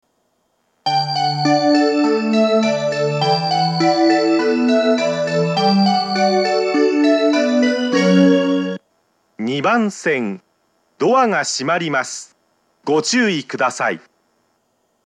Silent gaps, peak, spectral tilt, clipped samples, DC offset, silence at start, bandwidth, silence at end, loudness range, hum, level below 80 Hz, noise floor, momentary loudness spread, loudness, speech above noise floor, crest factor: none; 0 dBFS; -5 dB/octave; under 0.1%; under 0.1%; 0.85 s; 10 kHz; 1.1 s; 4 LU; none; -78 dBFS; -65 dBFS; 7 LU; -16 LUFS; 48 dB; 16 dB